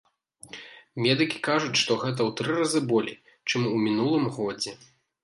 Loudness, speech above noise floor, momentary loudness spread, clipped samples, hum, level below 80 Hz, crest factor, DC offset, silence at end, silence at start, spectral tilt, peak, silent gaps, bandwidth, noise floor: -26 LUFS; 24 dB; 15 LU; under 0.1%; none; -70 dBFS; 18 dB; under 0.1%; 0.5 s; 0.45 s; -4.5 dB/octave; -8 dBFS; none; 11.5 kHz; -49 dBFS